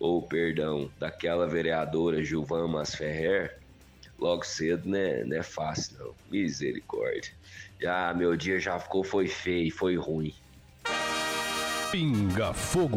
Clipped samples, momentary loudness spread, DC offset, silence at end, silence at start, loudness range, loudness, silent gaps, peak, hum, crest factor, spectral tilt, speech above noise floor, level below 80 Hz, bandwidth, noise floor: under 0.1%; 7 LU; under 0.1%; 0 s; 0 s; 2 LU; -30 LUFS; none; -14 dBFS; none; 16 dB; -5 dB/octave; 24 dB; -54 dBFS; 16 kHz; -54 dBFS